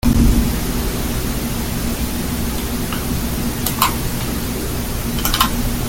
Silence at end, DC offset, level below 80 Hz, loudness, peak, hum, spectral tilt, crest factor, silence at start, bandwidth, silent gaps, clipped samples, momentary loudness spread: 0 s; under 0.1%; -24 dBFS; -20 LUFS; 0 dBFS; none; -4.5 dB/octave; 18 dB; 0.05 s; 17 kHz; none; under 0.1%; 6 LU